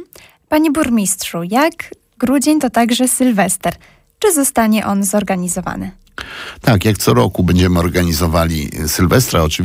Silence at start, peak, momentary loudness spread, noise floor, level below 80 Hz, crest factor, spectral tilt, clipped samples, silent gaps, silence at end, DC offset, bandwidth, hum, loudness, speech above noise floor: 0 s; -2 dBFS; 10 LU; -42 dBFS; -32 dBFS; 12 dB; -5 dB/octave; under 0.1%; none; 0 s; under 0.1%; 16.5 kHz; none; -14 LUFS; 27 dB